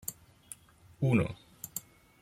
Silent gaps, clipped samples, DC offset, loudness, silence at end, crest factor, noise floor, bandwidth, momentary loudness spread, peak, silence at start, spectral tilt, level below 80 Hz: none; under 0.1%; under 0.1%; -33 LUFS; 0.4 s; 22 dB; -58 dBFS; 16.5 kHz; 21 LU; -14 dBFS; 0.1 s; -6 dB/octave; -62 dBFS